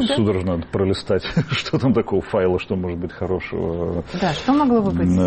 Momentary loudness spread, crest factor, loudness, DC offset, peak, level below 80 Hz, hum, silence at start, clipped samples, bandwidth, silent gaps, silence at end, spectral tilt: 7 LU; 12 dB; -21 LUFS; under 0.1%; -8 dBFS; -42 dBFS; none; 0 s; under 0.1%; 8.8 kHz; none; 0 s; -7 dB/octave